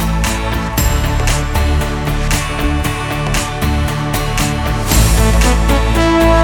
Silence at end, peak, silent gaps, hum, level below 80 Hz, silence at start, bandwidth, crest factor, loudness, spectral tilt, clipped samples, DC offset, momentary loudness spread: 0 s; 0 dBFS; none; none; -16 dBFS; 0 s; 19 kHz; 14 dB; -15 LUFS; -4.5 dB/octave; under 0.1%; under 0.1%; 6 LU